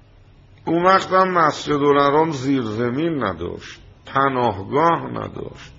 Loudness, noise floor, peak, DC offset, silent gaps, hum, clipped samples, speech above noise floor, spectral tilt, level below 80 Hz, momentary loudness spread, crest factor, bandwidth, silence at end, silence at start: -19 LUFS; -48 dBFS; -2 dBFS; under 0.1%; none; none; under 0.1%; 29 dB; -4.5 dB/octave; -52 dBFS; 15 LU; 18 dB; 7.8 kHz; 0.1 s; 0.65 s